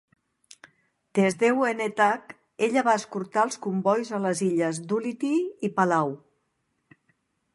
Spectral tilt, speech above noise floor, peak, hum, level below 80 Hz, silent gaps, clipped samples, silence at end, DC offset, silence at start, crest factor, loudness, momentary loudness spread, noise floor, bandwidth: -5.5 dB/octave; 50 dB; -8 dBFS; none; -76 dBFS; none; under 0.1%; 1.4 s; under 0.1%; 1.15 s; 18 dB; -25 LUFS; 7 LU; -75 dBFS; 11.5 kHz